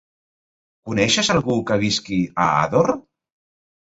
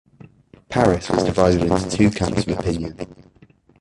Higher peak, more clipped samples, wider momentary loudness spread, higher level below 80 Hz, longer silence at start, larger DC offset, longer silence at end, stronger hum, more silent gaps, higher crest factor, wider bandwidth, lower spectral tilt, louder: about the same, -2 dBFS vs -2 dBFS; neither; second, 6 LU vs 12 LU; second, -50 dBFS vs -38 dBFS; first, 0.85 s vs 0.7 s; neither; first, 0.85 s vs 0.65 s; neither; neither; about the same, 18 dB vs 20 dB; second, 8 kHz vs 11.5 kHz; second, -4 dB/octave vs -6 dB/octave; about the same, -19 LUFS vs -19 LUFS